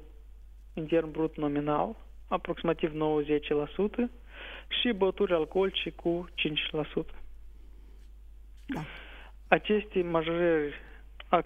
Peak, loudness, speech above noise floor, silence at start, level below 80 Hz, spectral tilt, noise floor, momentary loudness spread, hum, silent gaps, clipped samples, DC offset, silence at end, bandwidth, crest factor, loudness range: -8 dBFS; -30 LUFS; 19 dB; 0 s; -50 dBFS; -7.5 dB/octave; -49 dBFS; 17 LU; none; none; under 0.1%; under 0.1%; 0 s; 7.6 kHz; 24 dB; 5 LU